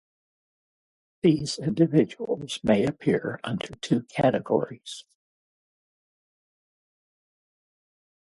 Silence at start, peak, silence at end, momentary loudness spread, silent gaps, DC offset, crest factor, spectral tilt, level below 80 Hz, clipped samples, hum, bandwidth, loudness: 1.25 s; -6 dBFS; 3.35 s; 11 LU; none; under 0.1%; 22 dB; -6.5 dB/octave; -62 dBFS; under 0.1%; none; 11.5 kHz; -25 LUFS